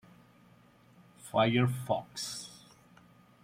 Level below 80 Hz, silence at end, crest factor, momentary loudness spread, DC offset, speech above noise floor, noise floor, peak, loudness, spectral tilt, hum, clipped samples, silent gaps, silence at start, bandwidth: -70 dBFS; 0.85 s; 22 dB; 23 LU; under 0.1%; 31 dB; -61 dBFS; -14 dBFS; -32 LUFS; -5.5 dB/octave; none; under 0.1%; none; 1.25 s; 16 kHz